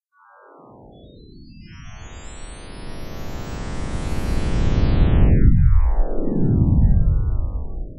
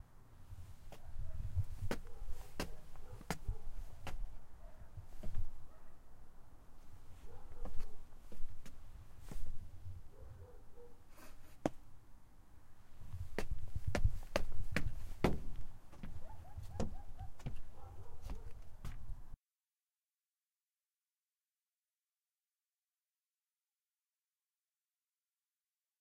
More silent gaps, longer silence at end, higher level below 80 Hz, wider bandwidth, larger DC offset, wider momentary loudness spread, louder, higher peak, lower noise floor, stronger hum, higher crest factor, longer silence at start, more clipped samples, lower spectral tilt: neither; second, 0 s vs 6.65 s; first, -20 dBFS vs -46 dBFS; about the same, 11 kHz vs 11 kHz; neither; about the same, 22 LU vs 22 LU; first, -21 LUFS vs -48 LUFS; first, -2 dBFS vs -16 dBFS; second, -51 dBFS vs under -90 dBFS; neither; second, 16 dB vs 24 dB; first, 1.35 s vs 0 s; neither; first, -8 dB/octave vs -6 dB/octave